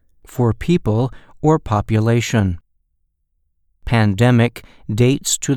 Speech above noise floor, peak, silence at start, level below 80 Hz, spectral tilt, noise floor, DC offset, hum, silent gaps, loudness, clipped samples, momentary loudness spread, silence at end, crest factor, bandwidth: 51 dB; 0 dBFS; 0.3 s; -38 dBFS; -6 dB/octave; -67 dBFS; under 0.1%; none; none; -17 LUFS; under 0.1%; 12 LU; 0 s; 18 dB; 15 kHz